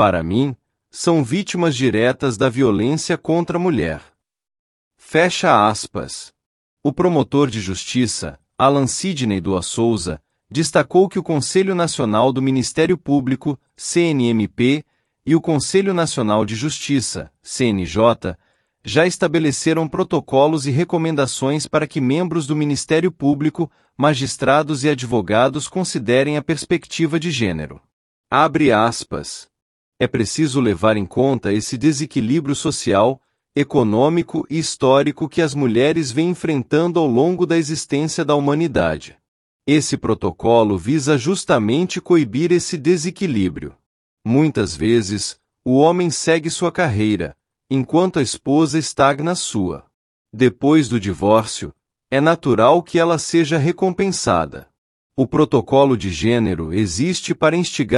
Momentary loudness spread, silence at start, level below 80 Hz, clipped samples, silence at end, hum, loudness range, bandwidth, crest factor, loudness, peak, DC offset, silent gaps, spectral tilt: 8 LU; 0 s; -50 dBFS; under 0.1%; 0 s; none; 2 LU; 12 kHz; 16 dB; -18 LUFS; -2 dBFS; under 0.1%; 4.59-4.91 s, 6.46-6.77 s, 27.93-28.24 s, 29.62-29.92 s, 39.28-39.60 s, 43.86-44.17 s, 49.94-50.25 s, 54.78-55.10 s; -5.5 dB/octave